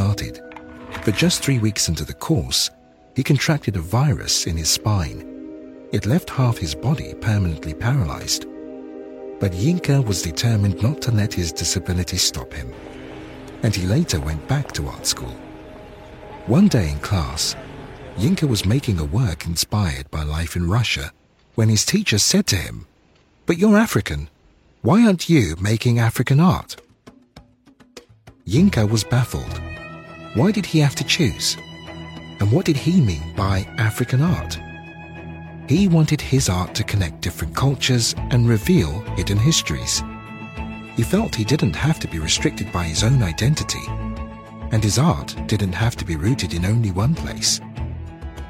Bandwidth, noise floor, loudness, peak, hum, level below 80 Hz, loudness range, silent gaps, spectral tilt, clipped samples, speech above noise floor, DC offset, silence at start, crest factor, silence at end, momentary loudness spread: 16.5 kHz; -56 dBFS; -20 LUFS; -2 dBFS; none; -36 dBFS; 4 LU; none; -5 dB/octave; under 0.1%; 37 dB; under 0.1%; 0 s; 18 dB; 0 s; 19 LU